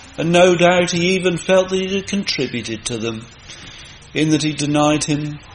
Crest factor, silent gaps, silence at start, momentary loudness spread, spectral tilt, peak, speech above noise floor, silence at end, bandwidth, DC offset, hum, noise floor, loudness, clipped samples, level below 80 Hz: 18 dB; none; 0 s; 21 LU; -4.5 dB/octave; 0 dBFS; 21 dB; 0 s; 10 kHz; under 0.1%; none; -38 dBFS; -17 LUFS; under 0.1%; -46 dBFS